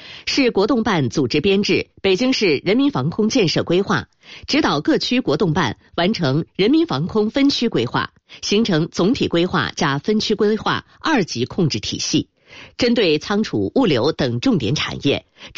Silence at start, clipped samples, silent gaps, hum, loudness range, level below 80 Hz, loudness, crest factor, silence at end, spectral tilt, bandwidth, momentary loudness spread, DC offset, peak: 0 s; under 0.1%; none; none; 2 LU; -48 dBFS; -18 LUFS; 12 dB; 0.1 s; -5 dB/octave; 7.8 kHz; 5 LU; under 0.1%; -6 dBFS